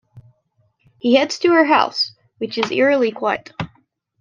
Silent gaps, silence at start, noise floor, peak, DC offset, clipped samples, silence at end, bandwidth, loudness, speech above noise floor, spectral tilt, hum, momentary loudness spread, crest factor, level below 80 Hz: none; 0.15 s; -64 dBFS; -2 dBFS; under 0.1%; under 0.1%; 0.55 s; 9.4 kHz; -17 LUFS; 47 dB; -4.5 dB/octave; none; 16 LU; 18 dB; -60 dBFS